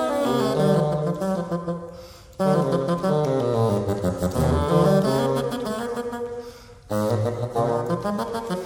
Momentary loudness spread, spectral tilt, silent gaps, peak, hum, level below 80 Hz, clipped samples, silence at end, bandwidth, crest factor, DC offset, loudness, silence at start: 11 LU; -7 dB/octave; none; -8 dBFS; none; -42 dBFS; under 0.1%; 0 s; 18.5 kHz; 14 dB; under 0.1%; -23 LUFS; 0 s